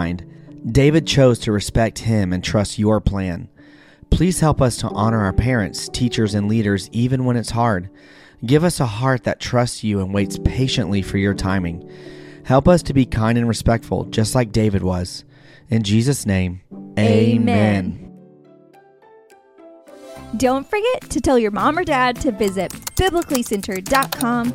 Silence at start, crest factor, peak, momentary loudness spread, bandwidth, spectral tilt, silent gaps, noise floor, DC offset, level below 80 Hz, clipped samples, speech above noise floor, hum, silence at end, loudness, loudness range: 0 s; 18 dB; 0 dBFS; 11 LU; 16.5 kHz; -6 dB/octave; none; -49 dBFS; under 0.1%; -34 dBFS; under 0.1%; 31 dB; none; 0 s; -19 LUFS; 3 LU